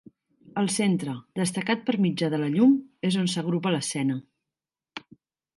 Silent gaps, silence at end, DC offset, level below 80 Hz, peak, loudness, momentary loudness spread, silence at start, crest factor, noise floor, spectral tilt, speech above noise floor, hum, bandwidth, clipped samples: none; 0.6 s; under 0.1%; -72 dBFS; -10 dBFS; -26 LUFS; 14 LU; 0.45 s; 16 dB; -89 dBFS; -5 dB/octave; 65 dB; none; 11.5 kHz; under 0.1%